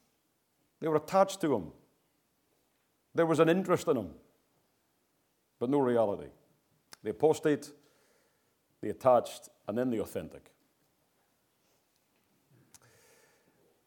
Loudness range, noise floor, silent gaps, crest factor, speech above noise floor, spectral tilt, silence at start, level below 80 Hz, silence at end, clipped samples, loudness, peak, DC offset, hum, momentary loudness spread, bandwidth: 5 LU; -76 dBFS; none; 22 dB; 46 dB; -6 dB/octave; 0.8 s; -72 dBFS; 3.5 s; under 0.1%; -30 LUFS; -12 dBFS; under 0.1%; none; 18 LU; 18.5 kHz